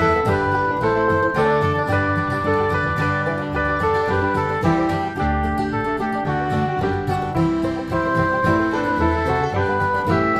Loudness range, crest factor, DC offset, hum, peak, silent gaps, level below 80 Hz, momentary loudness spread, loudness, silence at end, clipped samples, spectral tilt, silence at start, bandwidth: 2 LU; 14 dB; under 0.1%; none; -4 dBFS; none; -36 dBFS; 4 LU; -20 LUFS; 0 s; under 0.1%; -7.5 dB/octave; 0 s; 14 kHz